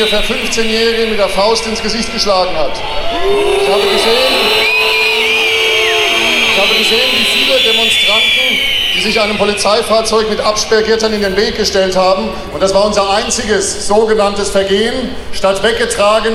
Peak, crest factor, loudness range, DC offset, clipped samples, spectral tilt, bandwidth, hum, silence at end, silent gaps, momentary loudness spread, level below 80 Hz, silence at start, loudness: 0 dBFS; 12 dB; 4 LU; under 0.1%; under 0.1%; -2 dB/octave; 16.5 kHz; none; 0 s; none; 6 LU; -32 dBFS; 0 s; -11 LUFS